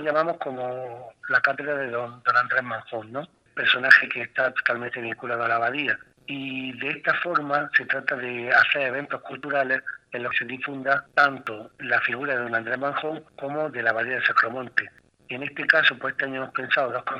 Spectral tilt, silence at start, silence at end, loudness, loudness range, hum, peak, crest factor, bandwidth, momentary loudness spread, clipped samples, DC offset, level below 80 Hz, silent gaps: -5 dB/octave; 0 s; 0 s; -24 LUFS; 4 LU; none; 0 dBFS; 26 dB; 10.5 kHz; 14 LU; under 0.1%; under 0.1%; -72 dBFS; none